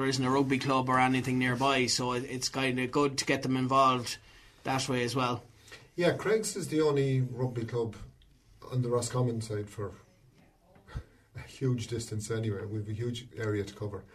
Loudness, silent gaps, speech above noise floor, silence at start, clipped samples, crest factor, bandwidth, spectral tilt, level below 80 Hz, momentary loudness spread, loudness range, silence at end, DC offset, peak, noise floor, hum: -30 LUFS; none; 32 dB; 0 s; under 0.1%; 20 dB; 13.5 kHz; -5 dB/octave; -58 dBFS; 15 LU; 9 LU; 0.1 s; under 0.1%; -12 dBFS; -62 dBFS; none